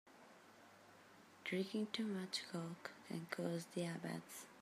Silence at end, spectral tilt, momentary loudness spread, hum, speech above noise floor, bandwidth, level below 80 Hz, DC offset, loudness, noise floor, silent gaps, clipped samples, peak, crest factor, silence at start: 0 s; -5 dB/octave; 21 LU; none; 20 dB; 15.5 kHz; under -90 dBFS; under 0.1%; -46 LUFS; -65 dBFS; none; under 0.1%; -26 dBFS; 22 dB; 0.05 s